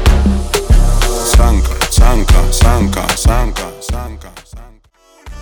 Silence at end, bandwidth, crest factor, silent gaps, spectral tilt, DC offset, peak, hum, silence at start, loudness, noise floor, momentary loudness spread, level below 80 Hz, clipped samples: 0 s; over 20 kHz; 10 dB; none; -4.5 dB/octave; under 0.1%; 0 dBFS; none; 0 s; -13 LUFS; -47 dBFS; 12 LU; -12 dBFS; under 0.1%